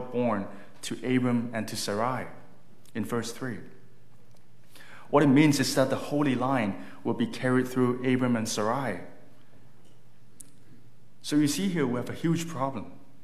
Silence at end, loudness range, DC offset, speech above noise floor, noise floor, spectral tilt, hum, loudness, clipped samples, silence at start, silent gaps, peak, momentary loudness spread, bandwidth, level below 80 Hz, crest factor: 0.3 s; 8 LU; 1%; 32 dB; -59 dBFS; -5.5 dB/octave; none; -28 LUFS; under 0.1%; 0 s; none; -8 dBFS; 14 LU; 15 kHz; -72 dBFS; 20 dB